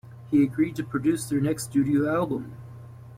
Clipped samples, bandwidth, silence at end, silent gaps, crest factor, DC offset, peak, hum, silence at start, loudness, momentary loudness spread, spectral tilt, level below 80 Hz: under 0.1%; 16 kHz; 0 s; none; 14 dB; under 0.1%; -12 dBFS; none; 0.05 s; -25 LUFS; 18 LU; -6.5 dB/octave; -58 dBFS